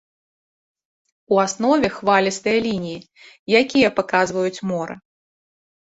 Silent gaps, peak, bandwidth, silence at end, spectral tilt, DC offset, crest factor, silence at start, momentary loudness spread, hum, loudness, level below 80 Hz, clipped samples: 3.39-3.46 s; -2 dBFS; 8.2 kHz; 0.95 s; -4.5 dB/octave; under 0.1%; 18 dB; 1.3 s; 15 LU; none; -19 LUFS; -58 dBFS; under 0.1%